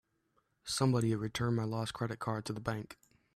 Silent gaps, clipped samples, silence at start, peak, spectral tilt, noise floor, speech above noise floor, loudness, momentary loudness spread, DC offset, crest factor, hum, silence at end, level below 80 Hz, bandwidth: none; under 0.1%; 0.65 s; -18 dBFS; -5.5 dB/octave; -77 dBFS; 43 dB; -35 LUFS; 11 LU; under 0.1%; 18 dB; none; 0.4 s; -64 dBFS; 13.5 kHz